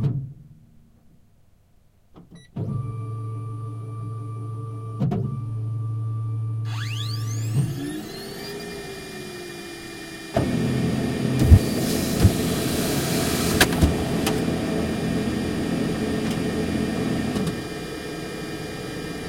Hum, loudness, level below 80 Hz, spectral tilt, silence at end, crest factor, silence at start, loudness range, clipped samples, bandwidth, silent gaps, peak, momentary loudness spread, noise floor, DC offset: none; -25 LUFS; -36 dBFS; -5.5 dB/octave; 0 s; 24 dB; 0 s; 13 LU; under 0.1%; 16.5 kHz; none; 0 dBFS; 14 LU; -57 dBFS; under 0.1%